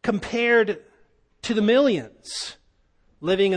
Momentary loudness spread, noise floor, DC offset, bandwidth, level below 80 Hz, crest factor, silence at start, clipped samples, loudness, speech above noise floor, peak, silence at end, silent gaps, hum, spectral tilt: 15 LU; -62 dBFS; under 0.1%; 10.5 kHz; -56 dBFS; 16 dB; 0.05 s; under 0.1%; -22 LUFS; 40 dB; -8 dBFS; 0 s; none; none; -4.5 dB/octave